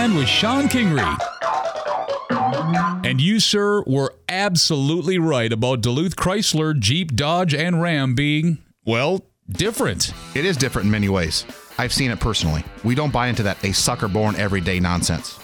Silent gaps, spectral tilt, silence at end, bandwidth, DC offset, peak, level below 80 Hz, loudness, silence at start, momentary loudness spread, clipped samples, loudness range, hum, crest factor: none; -4.5 dB/octave; 0 s; 19.5 kHz; under 0.1%; 0 dBFS; -40 dBFS; -20 LUFS; 0 s; 7 LU; under 0.1%; 2 LU; none; 20 dB